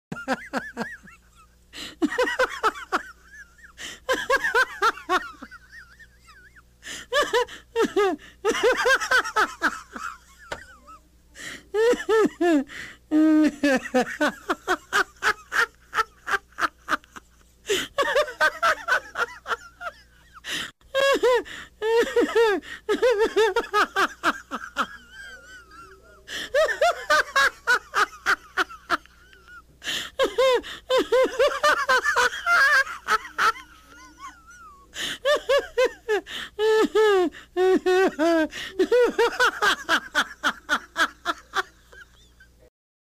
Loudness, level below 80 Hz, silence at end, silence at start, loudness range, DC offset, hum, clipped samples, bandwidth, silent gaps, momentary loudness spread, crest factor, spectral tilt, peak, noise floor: -23 LUFS; -56 dBFS; 1 s; 0.1 s; 5 LU; under 0.1%; none; under 0.1%; 15.5 kHz; none; 18 LU; 16 dB; -2.5 dB/octave; -8 dBFS; -55 dBFS